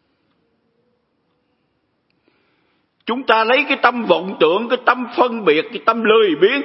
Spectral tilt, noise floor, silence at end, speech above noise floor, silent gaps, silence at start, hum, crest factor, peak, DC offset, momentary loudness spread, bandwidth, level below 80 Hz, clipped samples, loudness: -7 dB/octave; -67 dBFS; 0 s; 51 dB; none; 3.05 s; none; 18 dB; 0 dBFS; under 0.1%; 5 LU; 5.8 kHz; -72 dBFS; under 0.1%; -16 LUFS